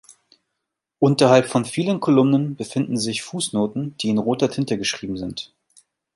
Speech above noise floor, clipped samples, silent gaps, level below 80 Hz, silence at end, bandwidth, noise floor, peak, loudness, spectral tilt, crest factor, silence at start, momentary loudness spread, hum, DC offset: 61 dB; under 0.1%; none; -58 dBFS; 0.7 s; 11.5 kHz; -81 dBFS; -2 dBFS; -21 LUFS; -5.5 dB/octave; 20 dB; 1 s; 12 LU; none; under 0.1%